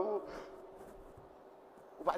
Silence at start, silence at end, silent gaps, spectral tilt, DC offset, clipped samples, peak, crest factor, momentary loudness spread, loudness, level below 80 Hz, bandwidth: 0 s; 0 s; none; -5.5 dB/octave; under 0.1%; under 0.1%; -18 dBFS; 24 dB; 19 LU; -45 LUFS; -66 dBFS; 15.5 kHz